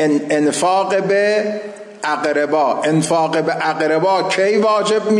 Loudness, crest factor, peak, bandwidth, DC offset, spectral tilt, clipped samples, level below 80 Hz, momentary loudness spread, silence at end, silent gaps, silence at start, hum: -16 LUFS; 10 dB; -6 dBFS; 11.5 kHz; under 0.1%; -4.5 dB/octave; under 0.1%; -70 dBFS; 5 LU; 0 s; none; 0 s; none